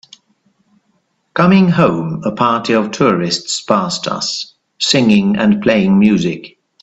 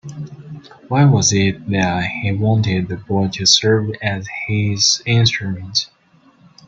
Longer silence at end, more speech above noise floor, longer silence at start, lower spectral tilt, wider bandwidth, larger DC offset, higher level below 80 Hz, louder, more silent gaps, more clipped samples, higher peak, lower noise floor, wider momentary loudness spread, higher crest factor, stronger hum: second, 0.35 s vs 0.8 s; first, 50 dB vs 36 dB; first, 1.35 s vs 0.05 s; about the same, -5 dB/octave vs -4 dB/octave; about the same, 8.2 kHz vs 7.8 kHz; neither; about the same, -50 dBFS vs -50 dBFS; first, -13 LUFS vs -16 LUFS; neither; neither; about the same, 0 dBFS vs 0 dBFS; first, -62 dBFS vs -52 dBFS; second, 10 LU vs 19 LU; about the same, 14 dB vs 18 dB; neither